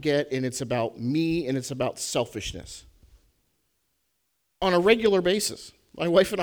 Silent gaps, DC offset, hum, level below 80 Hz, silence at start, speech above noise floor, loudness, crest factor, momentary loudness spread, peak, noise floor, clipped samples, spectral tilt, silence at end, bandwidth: none; under 0.1%; none; -52 dBFS; 0 s; 50 dB; -25 LUFS; 20 dB; 17 LU; -6 dBFS; -75 dBFS; under 0.1%; -4.5 dB/octave; 0 s; over 20 kHz